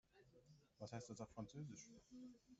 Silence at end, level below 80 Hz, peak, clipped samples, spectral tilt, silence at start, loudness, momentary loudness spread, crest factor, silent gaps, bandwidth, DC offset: 0 s; -80 dBFS; -38 dBFS; under 0.1%; -6.5 dB/octave; 0.1 s; -57 LUFS; 8 LU; 20 dB; none; 8 kHz; under 0.1%